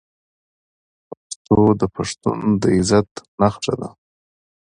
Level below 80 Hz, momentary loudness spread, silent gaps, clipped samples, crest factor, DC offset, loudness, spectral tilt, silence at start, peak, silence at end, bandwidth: -44 dBFS; 17 LU; 1.36-1.45 s, 3.11-3.15 s, 3.28-3.38 s; under 0.1%; 20 dB; under 0.1%; -19 LUFS; -6 dB/octave; 1.3 s; 0 dBFS; 0.9 s; 10.5 kHz